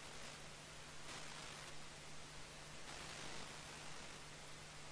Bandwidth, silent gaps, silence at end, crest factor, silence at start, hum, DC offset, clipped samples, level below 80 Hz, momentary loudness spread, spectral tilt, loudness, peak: 11 kHz; none; 0 s; 14 dB; 0 s; none; under 0.1%; under 0.1%; -68 dBFS; 4 LU; -2 dB/octave; -53 LUFS; -38 dBFS